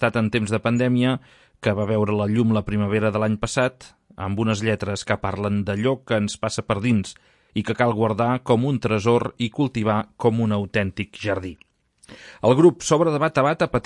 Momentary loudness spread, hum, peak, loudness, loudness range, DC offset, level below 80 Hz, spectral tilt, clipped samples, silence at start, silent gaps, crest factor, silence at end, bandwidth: 7 LU; none; -4 dBFS; -22 LUFS; 3 LU; under 0.1%; -50 dBFS; -6 dB/octave; under 0.1%; 0 s; none; 18 dB; 0.05 s; 11.5 kHz